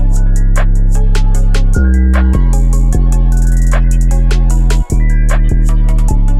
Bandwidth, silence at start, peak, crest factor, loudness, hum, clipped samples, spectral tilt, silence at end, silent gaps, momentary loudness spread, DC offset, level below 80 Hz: 11 kHz; 0 s; 0 dBFS; 6 dB; -13 LUFS; none; under 0.1%; -6.5 dB/octave; 0 s; none; 3 LU; under 0.1%; -8 dBFS